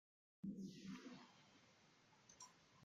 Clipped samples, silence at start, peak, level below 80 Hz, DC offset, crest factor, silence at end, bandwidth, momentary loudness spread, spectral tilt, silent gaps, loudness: under 0.1%; 0.45 s; -42 dBFS; -88 dBFS; under 0.1%; 18 dB; 0 s; 13 kHz; 14 LU; -5 dB/octave; none; -57 LUFS